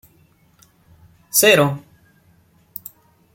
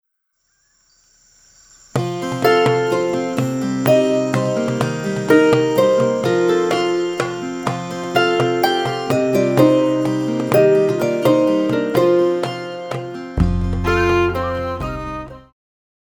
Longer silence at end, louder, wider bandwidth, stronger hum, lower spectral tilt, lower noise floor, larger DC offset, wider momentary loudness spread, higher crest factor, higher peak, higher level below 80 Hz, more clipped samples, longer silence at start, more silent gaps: first, 1.55 s vs 0.65 s; about the same, -15 LUFS vs -17 LUFS; second, 17 kHz vs over 20 kHz; neither; second, -3 dB/octave vs -6 dB/octave; second, -56 dBFS vs -69 dBFS; neither; first, 24 LU vs 11 LU; about the same, 22 dB vs 18 dB; about the same, 0 dBFS vs 0 dBFS; second, -62 dBFS vs -36 dBFS; neither; second, 1.35 s vs 1.95 s; neither